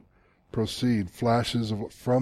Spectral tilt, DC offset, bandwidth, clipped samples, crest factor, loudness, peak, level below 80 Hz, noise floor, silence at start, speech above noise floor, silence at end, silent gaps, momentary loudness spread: -6.5 dB/octave; under 0.1%; 14.5 kHz; under 0.1%; 18 dB; -28 LUFS; -10 dBFS; -54 dBFS; -62 dBFS; 0.55 s; 36 dB; 0 s; none; 7 LU